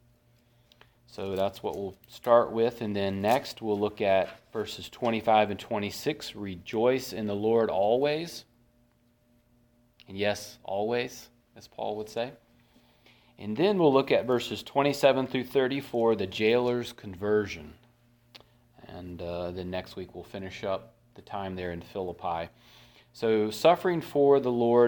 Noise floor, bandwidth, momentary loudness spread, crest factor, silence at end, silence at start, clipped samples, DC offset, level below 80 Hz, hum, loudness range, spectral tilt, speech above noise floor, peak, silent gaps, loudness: -66 dBFS; 19 kHz; 16 LU; 22 dB; 0 s; 1.15 s; under 0.1%; under 0.1%; -64 dBFS; none; 10 LU; -5.5 dB/octave; 38 dB; -6 dBFS; none; -28 LUFS